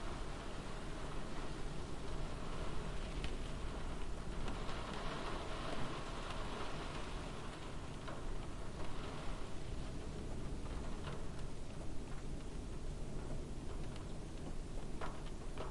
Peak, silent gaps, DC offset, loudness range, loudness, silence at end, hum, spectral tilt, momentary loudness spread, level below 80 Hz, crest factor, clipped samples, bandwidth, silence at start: -28 dBFS; none; under 0.1%; 3 LU; -47 LUFS; 0 s; none; -5 dB/octave; 4 LU; -46 dBFS; 14 dB; under 0.1%; 11.5 kHz; 0 s